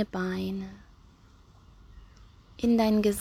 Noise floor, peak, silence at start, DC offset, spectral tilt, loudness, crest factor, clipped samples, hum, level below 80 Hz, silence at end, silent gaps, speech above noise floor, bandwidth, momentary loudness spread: -56 dBFS; -14 dBFS; 0 s; under 0.1%; -6 dB/octave; -28 LUFS; 16 dB; under 0.1%; none; -52 dBFS; 0 s; none; 29 dB; 16 kHz; 14 LU